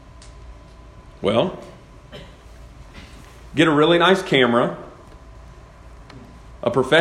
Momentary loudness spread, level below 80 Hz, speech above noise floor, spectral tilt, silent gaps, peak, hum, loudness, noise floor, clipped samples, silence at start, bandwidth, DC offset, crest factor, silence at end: 27 LU; -46 dBFS; 26 dB; -5.5 dB/octave; none; -2 dBFS; none; -18 LUFS; -43 dBFS; under 0.1%; 0.25 s; 12.5 kHz; under 0.1%; 20 dB; 0 s